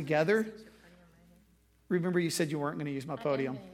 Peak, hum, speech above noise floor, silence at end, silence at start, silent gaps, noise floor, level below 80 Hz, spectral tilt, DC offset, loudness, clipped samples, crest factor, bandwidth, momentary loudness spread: -14 dBFS; none; 34 dB; 0 s; 0 s; none; -66 dBFS; -68 dBFS; -5.5 dB/octave; under 0.1%; -32 LUFS; under 0.1%; 18 dB; 16.5 kHz; 9 LU